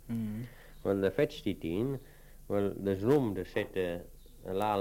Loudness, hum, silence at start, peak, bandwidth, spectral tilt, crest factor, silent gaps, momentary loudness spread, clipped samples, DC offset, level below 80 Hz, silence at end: -33 LUFS; none; 0 s; -14 dBFS; 16.5 kHz; -7.5 dB/octave; 18 dB; none; 14 LU; under 0.1%; under 0.1%; -54 dBFS; 0 s